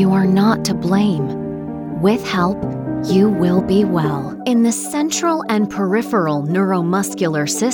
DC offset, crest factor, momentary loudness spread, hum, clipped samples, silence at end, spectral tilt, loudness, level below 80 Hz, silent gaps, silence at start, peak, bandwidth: under 0.1%; 14 dB; 8 LU; none; under 0.1%; 0 s; -5.5 dB/octave; -17 LUFS; -48 dBFS; none; 0 s; -2 dBFS; 19 kHz